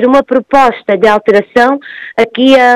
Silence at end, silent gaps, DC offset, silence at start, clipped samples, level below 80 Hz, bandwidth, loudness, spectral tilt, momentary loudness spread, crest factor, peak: 0 s; none; under 0.1%; 0 s; 2%; -44 dBFS; 12.5 kHz; -9 LUFS; -5 dB/octave; 7 LU; 8 dB; 0 dBFS